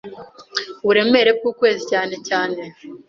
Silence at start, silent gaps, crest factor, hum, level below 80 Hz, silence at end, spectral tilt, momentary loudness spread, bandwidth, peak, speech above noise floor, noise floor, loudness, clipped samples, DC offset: 0.05 s; none; 18 dB; none; -64 dBFS; 0.1 s; -3.5 dB/octave; 14 LU; 7.4 kHz; -2 dBFS; 20 dB; -38 dBFS; -18 LUFS; under 0.1%; under 0.1%